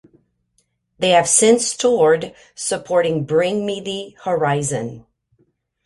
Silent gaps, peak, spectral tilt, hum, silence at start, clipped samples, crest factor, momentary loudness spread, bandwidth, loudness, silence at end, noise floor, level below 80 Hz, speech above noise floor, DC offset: none; 0 dBFS; -3.5 dB/octave; none; 1 s; under 0.1%; 18 dB; 14 LU; 11.5 kHz; -18 LUFS; 0.85 s; -67 dBFS; -60 dBFS; 49 dB; under 0.1%